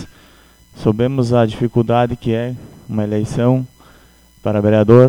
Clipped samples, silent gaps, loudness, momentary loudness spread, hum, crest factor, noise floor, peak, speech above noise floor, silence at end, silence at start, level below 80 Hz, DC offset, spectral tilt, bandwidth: 0.2%; none; -17 LUFS; 11 LU; none; 16 dB; -48 dBFS; 0 dBFS; 34 dB; 0 s; 0 s; -44 dBFS; under 0.1%; -8.5 dB/octave; 10.5 kHz